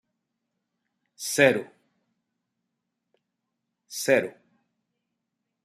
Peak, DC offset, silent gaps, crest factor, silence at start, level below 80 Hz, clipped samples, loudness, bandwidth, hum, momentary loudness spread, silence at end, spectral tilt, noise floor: -6 dBFS; under 0.1%; none; 26 dB; 1.2 s; -76 dBFS; under 0.1%; -23 LUFS; 14.5 kHz; none; 17 LU; 1.35 s; -3.5 dB/octave; -82 dBFS